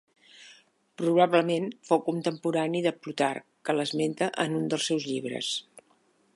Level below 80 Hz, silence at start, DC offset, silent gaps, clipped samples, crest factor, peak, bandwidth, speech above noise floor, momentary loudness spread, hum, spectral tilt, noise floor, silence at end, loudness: -80 dBFS; 0.4 s; under 0.1%; none; under 0.1%; 20 dB; -8 dBFS; 11.5 kHz; 39 dB; 8 LU; none; -4.5 dB/octave; -66 dBFS; 0.55 s; -28 LUFS